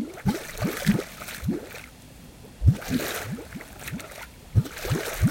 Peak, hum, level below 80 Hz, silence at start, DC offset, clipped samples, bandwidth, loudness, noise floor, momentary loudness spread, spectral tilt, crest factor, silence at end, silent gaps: -6 dBFS; none; -40 dBFS; 0 s; under 0.1%; under 0.1%; 17 kHz; -28 LUFS; -47 dBFS; 18 LU; -5.5 dB/octave; 22 dB; 0 s; none